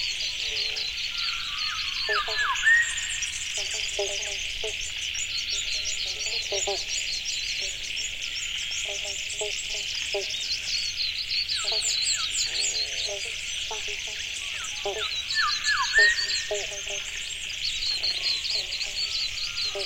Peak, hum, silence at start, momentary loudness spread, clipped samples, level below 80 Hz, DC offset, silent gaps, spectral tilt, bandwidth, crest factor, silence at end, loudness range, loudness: -8 dBFS; none; 0 s; 7 LU; under 0.1%; -50 dBFS; under 0.1%; none; 1.5 dB/octave; 16.5 kHz; 20 dB; 0 s; 3 LU; -26 LUFS